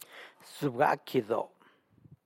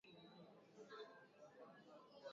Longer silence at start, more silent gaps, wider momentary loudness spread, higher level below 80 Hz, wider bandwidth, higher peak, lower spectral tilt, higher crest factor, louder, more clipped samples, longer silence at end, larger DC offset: about the same, 0.1 s vs 0.05 s; neither; first, 20 LU vs 7 LU; first, -78 dBFS vs under -90 dBFS; first, 16 kHz vs 7.4 kHz; first, -14 dBFS vs -44 dBFS; first, -6 dB/octave vs -3 dB/octave; about the same, 20 dB vs 18 dB; first, -31 LUFS vs -63 LUFS; neither; first, 0.8 s vs 0 s; neither